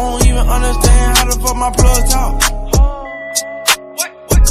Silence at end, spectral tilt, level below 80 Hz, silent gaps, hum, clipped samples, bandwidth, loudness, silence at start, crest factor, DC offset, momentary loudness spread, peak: 0 s; -3.5 dB/octave; -14 dBFS; none; none; under 0.1%; 15.5 kHz; -14 LUFS; 0 s; 12 dB; under 0.1%; 7 LU; 0 dBFS